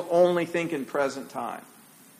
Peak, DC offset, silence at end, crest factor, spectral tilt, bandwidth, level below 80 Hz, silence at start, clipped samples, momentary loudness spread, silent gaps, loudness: -10 dBFS; under 0.1%; 0.55 s; 18 dB; -5.5 dB/octave; 15.5 kHz; -74 dBFS; 0 s; under 0.1%; 14 LU; none; -27 LUFS